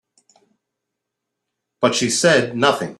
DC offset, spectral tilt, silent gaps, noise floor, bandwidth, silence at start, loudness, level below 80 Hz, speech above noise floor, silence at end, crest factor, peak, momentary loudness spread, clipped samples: under 0.1%; -3 dB/octave; none; -80 dBFS; 14 kHz; 1.8 s; -17 LUFS; -62 dBFS; 63 dB; 0.05 s; 20 dB; -2 dBFS; 5 LU; under 0.1%